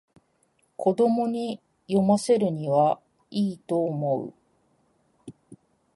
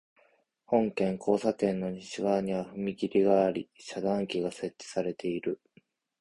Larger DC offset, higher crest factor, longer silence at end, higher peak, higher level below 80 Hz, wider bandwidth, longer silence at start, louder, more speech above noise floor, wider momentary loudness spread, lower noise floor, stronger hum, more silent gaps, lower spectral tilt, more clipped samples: neither; about the same, 16 dB vs 20 dB; second, 0.4 s vs 0.65 s; about the same, -10 dBFS vs -12 dBFS; about the same, -70 dBFS vs -66 dBFS; about the same, 11.5 kHz vs 11 kHz; about the same, 0.8 s vs 0.7 s; first, -25 LUFS vs -30 LUFS; first, 45 dB vs 38 dB; about the same, 12 LU vs 10 LU; about the same, -68 dBFS vs -68 dBFS; neither; neither; about the same, -7 dB/octave vs -6.5 dB/octave; neither